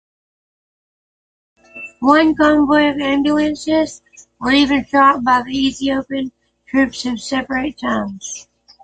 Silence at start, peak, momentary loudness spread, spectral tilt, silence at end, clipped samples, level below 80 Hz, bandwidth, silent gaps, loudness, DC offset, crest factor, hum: 1.75 s; -2 dBFS; 13 LU; -4 dB/octave; 0.4 s; under 0.1%; -46 dBFS; 9.2 kHz; none; -16 LUFS; under 0.1%; 16 dB; none